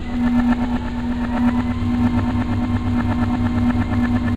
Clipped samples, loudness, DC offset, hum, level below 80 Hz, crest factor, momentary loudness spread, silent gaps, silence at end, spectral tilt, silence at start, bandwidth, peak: under 0.1%; -20 LUFS; under 0.1%; none; -28 dBFS; 14 dB; 4 LU; none; 0 s; -8 dB/octave; 0 s; 8.4 kHz; -6 dBFS